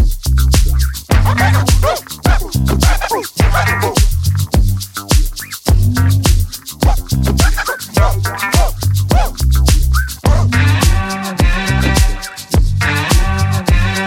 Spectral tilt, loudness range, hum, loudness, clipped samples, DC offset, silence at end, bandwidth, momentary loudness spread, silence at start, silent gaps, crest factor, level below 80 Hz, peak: -5 dB/octave; 1 LU; none; -14 LUFS; under 0.1%; under 0.1%; 0 s; 17 kHz; 5 LU; 0 s; none; 12 dB; -16 dBFS; 0 dBFS